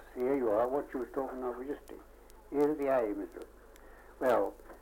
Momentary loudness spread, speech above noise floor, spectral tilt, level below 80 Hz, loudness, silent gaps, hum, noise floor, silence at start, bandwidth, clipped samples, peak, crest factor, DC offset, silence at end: 16 LU; 21 dB; -6.5 dB/octave; -58 dBFS; -33 LUFS; none; 50 Hz at -60 dBFS; -54 dBFS; 0 s; 17 kHz; under 0.1%; -16 dBFS; 18 dB; under 0.1%; 0 s